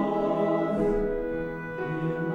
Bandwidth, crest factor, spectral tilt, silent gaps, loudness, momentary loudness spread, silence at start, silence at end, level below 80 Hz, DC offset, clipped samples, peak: 8.6 kHz; 14 dB; -9 dB/octave; none; -28 LUFS; 7 LU; 0 s; 0 s; -44 dBFS; under 0.1%; under 0.1%; -14 dBFS